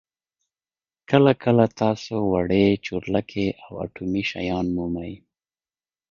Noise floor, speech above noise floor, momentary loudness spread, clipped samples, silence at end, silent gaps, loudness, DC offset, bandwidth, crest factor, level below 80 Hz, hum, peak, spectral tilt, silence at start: under -90 dBFS; over 68 dB; 12 LU; under 0.1%; 0.95 s; none; -22 LUFS; under 0.1%; 7.2 kHz; 22 dB; -48 dBFS; none; -2 dBFS; -7.5 dB/octave; 1.1 s